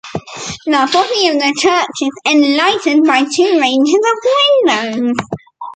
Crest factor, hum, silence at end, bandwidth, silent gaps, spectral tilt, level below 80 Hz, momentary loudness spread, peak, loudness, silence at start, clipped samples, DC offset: 12 dB; none; 0 s; 9.2 kHz; none; -3 dB/octave; -54 dBFS; 12 LU; 0 dBFS; -12 LUFS; 0.05 s; under 0.1%; under 0.1%